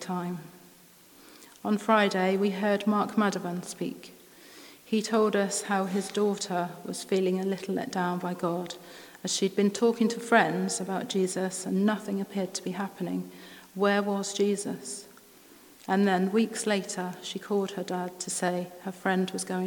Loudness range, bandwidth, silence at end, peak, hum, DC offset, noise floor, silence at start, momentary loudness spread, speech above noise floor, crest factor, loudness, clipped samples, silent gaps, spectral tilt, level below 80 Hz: 3 LU; 19 kHz; 0 s; -6 dBFS; none; under 0.1%; -55 dBFS; 0 s; 13 LU; 27 dB; 24 dB; -29 LUFS; under 0.1%; none; -4.5 dB/octave; -78 dBFS